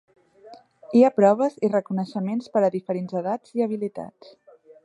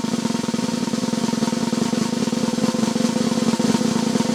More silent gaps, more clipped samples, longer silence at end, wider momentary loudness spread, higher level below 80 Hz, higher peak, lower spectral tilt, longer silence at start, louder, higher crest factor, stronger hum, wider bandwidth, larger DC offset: neither; neither; first, 0.75 s vs 0 s; first, 12 LU vs 3 LU; second, -74 dBFS vs -56 dBFS; about the same, -4 dBFS vs -4 dBFS; first, -8 dB/octave vs -4.5 dB/octave; first, 0.45 s vs 0 s; about the same, -23 LUFS vs -21 LUFS; about the same, 20 dB vs 16 dB; neither; second, 10 kHz vs 14.5 kHz; neither